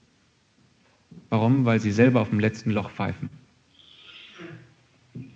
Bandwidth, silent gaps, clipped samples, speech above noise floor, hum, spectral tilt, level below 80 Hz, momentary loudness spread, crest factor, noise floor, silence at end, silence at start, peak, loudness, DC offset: 7.8 kHz; none; under 0.1%; 41 dB; none; -7.5 dB/octave; -64 dBFS; 24 LU; 20 dB; -64 dBFS; 0.1 s; 1.15 s; -6 dBFS; -23 LUFS; under 0.1%